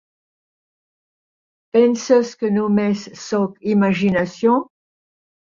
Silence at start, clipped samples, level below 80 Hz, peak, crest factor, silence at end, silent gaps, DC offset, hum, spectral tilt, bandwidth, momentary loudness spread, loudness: 1.75 s; under 0.1%; -60 dBFS; -4 dBFS; 16 dB; 0.85 s; none; under 0.1%; none; -6.5 dB/octave; 7.4 kHz; 6 LU; -18 LUFS